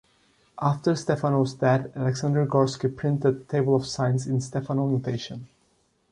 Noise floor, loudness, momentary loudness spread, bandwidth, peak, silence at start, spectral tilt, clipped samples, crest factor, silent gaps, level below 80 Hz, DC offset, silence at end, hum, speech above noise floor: -67 dBFS; -25 LUFS; 5 LU; 10.5 kHz; -8 dBFS; 0.55 s; -7 dB/octave; under 0.1%; 18 dB; none; -60 dBFS; under 0.1%; 0.65 s; none; 43 dB